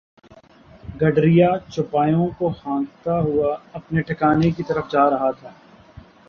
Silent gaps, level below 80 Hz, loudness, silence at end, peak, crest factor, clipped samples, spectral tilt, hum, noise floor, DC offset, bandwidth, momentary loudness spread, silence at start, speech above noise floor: none; -48 dBFS; -20 LUFS; 0.3 s; -4 dBFS; 18 dB; under 0.1%; -9 dB/octave; none; -48 dBFS; under 0.1%; 6.8 kHz; 10 LU; 0.85 s; 29 dB